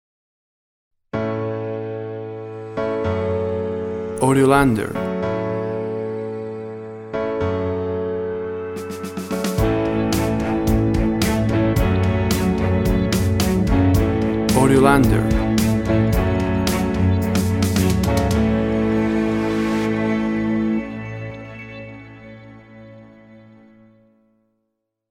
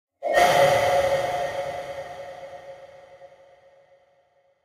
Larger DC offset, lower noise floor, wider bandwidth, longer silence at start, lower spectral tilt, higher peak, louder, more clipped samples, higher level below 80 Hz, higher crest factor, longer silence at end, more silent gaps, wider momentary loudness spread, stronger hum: neither; first, -76 dBFS vs -64 dBFS; about the same, 17 kHz vs 16 kHz; first, 1.15 s vs 0.2 s; first, -6.5 dB/octave vs -3 dB/octave; first, 0 dBFS vs -6 dBFS; about the same, -20 LUFS vs -22 LUFS; neither; first, -32 dBFS vs -56 dBFS; about the same, 20 dB vs 20 dB; first, 1.7 s vs 1.4 s; neither; second, 13 LU vs 23 LU; neither